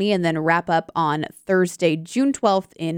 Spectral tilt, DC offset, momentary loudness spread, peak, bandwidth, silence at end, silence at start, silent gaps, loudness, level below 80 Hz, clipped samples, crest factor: -5.5 dB/octave; under 0.1%; 4 LU; -4 dBFS; 16.5 kHz; 0 s; 0 s; none; -21 LUFS; -64 dBFS; under 0.1%; 16 dB